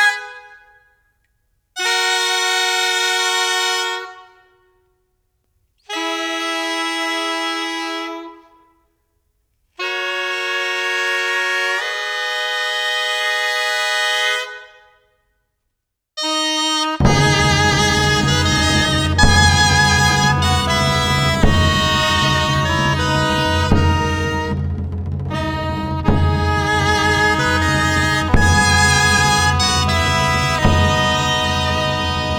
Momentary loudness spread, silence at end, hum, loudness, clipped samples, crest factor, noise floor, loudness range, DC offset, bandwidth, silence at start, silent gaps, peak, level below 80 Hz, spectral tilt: 10 LU; 0 s; none; -16 LUFS; under 0.1%; 16 dB; -76 dBFS; 9 LU; under 0.1%; 20 kHz; 0 s; none; 0 dBFS; -30 dBFS; -3.5 dB/octave